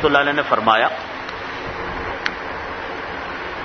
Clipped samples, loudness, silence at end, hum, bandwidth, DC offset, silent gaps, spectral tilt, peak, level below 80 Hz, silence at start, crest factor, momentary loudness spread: under 0.1%; -21 LUFS; 0 s; none; 6.6 kHz; under 0.1%; none; -5 dB/octave; 0 dBFS; -44 dBFS; 0 s; 22 dB; 12 LU